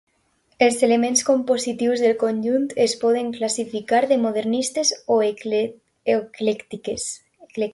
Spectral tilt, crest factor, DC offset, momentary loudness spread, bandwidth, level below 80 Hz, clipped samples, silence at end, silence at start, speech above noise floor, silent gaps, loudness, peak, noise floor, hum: -3 dB/octave; 18 dB; under 0.1%; 10 LU; 11.5 kHz; -64 dBFS; under 0.1%; 0 s; 0.6 s; 45 dB; none; -21 LUFS; -4 dBFS; -65 dBFS; none